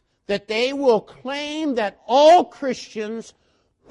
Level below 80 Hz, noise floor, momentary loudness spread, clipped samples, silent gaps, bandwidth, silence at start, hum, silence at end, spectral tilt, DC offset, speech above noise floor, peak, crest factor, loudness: -62 dBFS; -58 dBFS; 16 LU; under 0.1%; none; 11.5 kHz; 0.3 s; none; 0.7 s; -4 dB/octave; under 0.1%; 38 dB; -4 dBFS; 16 dB; -20 LUFS